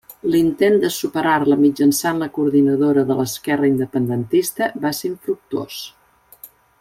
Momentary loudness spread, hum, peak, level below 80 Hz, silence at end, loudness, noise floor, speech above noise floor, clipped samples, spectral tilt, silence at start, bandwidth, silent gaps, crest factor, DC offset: 10 LU; none; -4 dBFS; -58 dBFS; 0.35 s; -18 LUFS; -45 dBFS; 27 dB; under 0.1%; -5.5 dB/octave; 0.1 s; 16.5 kHz; none; 14 dB; under 0.1%